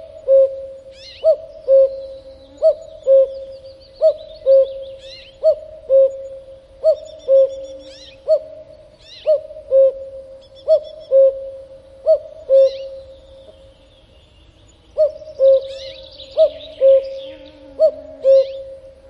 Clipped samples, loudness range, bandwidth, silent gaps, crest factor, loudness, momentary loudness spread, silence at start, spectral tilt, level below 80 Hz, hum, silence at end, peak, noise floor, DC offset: under 0.1%; 4 LU; 6 kHz; none; 14 dB; -16 LUFS; 22 LU; 0.15 s; -4.5 dB/octave; -52 dBFS; none; 0.35 s; -4 dBFS; -48 dBFS; under 0.1%